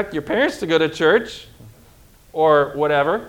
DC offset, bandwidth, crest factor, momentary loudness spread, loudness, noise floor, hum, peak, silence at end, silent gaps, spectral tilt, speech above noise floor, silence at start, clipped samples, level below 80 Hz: under 0.1%; 16.5 kHz; 16 dB; 14 LU; -18 LUFS; -49 dBFS; none; -2 dBFS; 0 s; none; -5 dB/octave; 31 dB; 0 s; under 0.1%; -52 dBFS